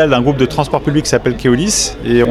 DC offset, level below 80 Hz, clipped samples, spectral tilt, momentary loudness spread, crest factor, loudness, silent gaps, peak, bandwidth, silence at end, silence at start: under 0.1%; -32 dBFS; under 0.1%; -4.5 dB/octave; 3 LU; 12 dB; -13 LUFS; none; 0 dBFS; 15.5 kHz; 0 s; 0 s